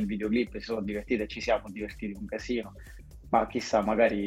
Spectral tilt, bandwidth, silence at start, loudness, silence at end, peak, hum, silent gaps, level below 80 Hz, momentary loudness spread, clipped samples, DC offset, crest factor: -5.5 dB/octave; 15 kHz; 0 s; -30 LUFS; 0 s; -10 dBFS; none; none; -48 dBFS; 13 LU; under 0.1%; under 0.1%; 20 dB